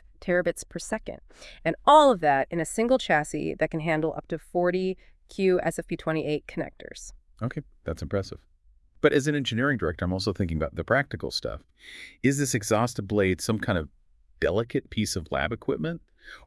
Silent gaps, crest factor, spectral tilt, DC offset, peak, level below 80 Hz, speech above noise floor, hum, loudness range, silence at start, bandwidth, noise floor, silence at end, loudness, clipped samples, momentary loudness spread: none; 22 dB; -5 dB/octave; under 0.1%; -4 dBFS; -50 dBFS; 32 dB; none; 7 LU; 0.2 s; 12 kHz; -59 dBFS; 0.1 s; -26 LUFS; under 0.1%; 16 LU